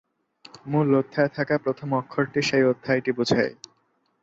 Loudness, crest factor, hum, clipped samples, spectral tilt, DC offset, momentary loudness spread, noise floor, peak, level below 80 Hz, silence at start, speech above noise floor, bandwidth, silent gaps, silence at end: -24 LUFS; 18 dB; none; under 0.1%; -6 dB/octave; under 0.1%; 6 LU; -69 dBFS; -8 dBFS; -64 dBFS; 0.65 s; 45 dB; 7.8 kHz; none; 0.7 s